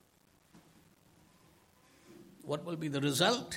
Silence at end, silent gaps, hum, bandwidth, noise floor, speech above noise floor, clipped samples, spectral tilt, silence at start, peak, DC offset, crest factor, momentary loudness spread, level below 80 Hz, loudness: 0 s; none; none; 16.5 kHz; -68 dBFS; 35 dB; under 0.1%; -4 dB/octave; 0.55 s; -14 dBFS; under 0.1%; 24 dB; 27 LU; -76 dBFS; -33 LUFS